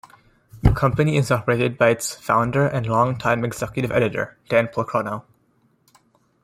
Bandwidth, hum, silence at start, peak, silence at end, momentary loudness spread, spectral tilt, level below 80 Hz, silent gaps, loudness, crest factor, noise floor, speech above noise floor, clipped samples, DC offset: 16 kHz; none; 0.55 s; -2 dBFS; 1.2 s; 7 LU; -6 dB/octave; -36 dBFS; none; -21 LUFS; 20 dB; -62 dBFS; 42 dB; under 0.1%; under 0.1%